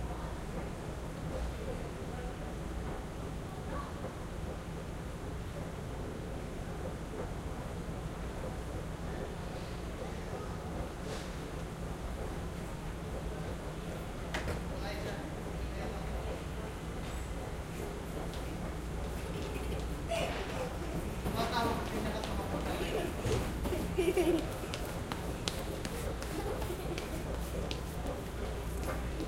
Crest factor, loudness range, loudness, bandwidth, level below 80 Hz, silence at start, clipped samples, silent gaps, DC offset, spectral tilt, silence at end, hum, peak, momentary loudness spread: 28 dB; 7 LU; -39 LUFS; 16 kHz; -44 dBFS; 0 s; under 0.1%; none; under 0.1%; -5.5 dB/octave; 0 s; none; -10 dBFS; 7 LU